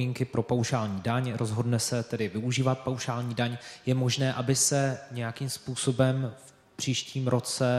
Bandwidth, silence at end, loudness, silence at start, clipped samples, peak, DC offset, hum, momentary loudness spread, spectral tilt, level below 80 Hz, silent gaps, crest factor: 13.5 kHz; 0 s; -29 LUFS; 0 s; under 0.1%; -10 dBFS; under 0.1%; none; 8 LU; -4.5 dB/octave; -64 dBFS; none; 18 dB